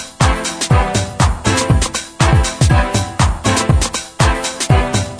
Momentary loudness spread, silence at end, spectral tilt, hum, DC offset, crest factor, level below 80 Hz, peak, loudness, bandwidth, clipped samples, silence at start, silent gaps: 5 LU; 0 s; -4.5 dB/octave; none; under 0.1%; 14 dB; -20 dBFS; 0 dBFS; -15 LUFS; 11 kHz; under 0.1%; 0 s; none